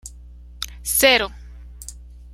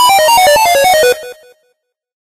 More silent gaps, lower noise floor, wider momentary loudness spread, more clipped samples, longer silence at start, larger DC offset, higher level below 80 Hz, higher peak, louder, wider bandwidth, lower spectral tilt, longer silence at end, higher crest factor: neither; second, -41 dBFS vs -63 dBFS; first, 24 LU vs 6 LU; neither; about the same, 0.05 s vs 0 s; neither; about the same, -40 dBFS vs -44 dBFS; about the same, 0 dBFS vs 0 dBFS; second, -17 LUFS vs -8 LUFS; first, 16 kHz vs 14.5 kHz; about the same, -1 dB/octave vs 0 dB/octave; second, 0 s vs 0.95 s; first, 24 dB vs 10 dB